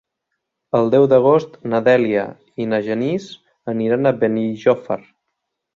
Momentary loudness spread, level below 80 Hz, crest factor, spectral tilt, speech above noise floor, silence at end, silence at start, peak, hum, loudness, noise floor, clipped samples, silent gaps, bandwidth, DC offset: 14 LU; -62 dBFS; 16 dB; -8 dB/octave; 60 dB; 0.75 s; 0.75 s; -2 dBFS; none; -18 LUFS; -77 dBFS; under 0.1%; none; 7.2 kHz; under 0.1%